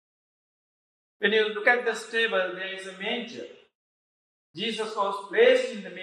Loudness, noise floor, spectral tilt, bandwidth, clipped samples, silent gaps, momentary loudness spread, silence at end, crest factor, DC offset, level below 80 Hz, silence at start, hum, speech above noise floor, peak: -26 LUFS; under -90 dBFS; -3 dB/octave; 10.5 kHz; under 0.1%; 3.75-4.54 s; 13 LU; 0 s; 22 dB; under 0.1%; under -90 dBFS; 1.2 s; none; over 64 dB; -6 dBFS